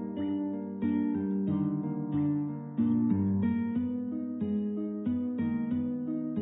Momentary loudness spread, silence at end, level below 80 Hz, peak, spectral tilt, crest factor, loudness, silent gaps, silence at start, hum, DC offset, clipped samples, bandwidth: 6 LU; 0 s; -56 dBFS; -16 dBFS; -12.5 dB/octave; 14 dB; -31 LUFS; none; 0 s; none; under 0.1%; under 0.1%; 3.7 kHz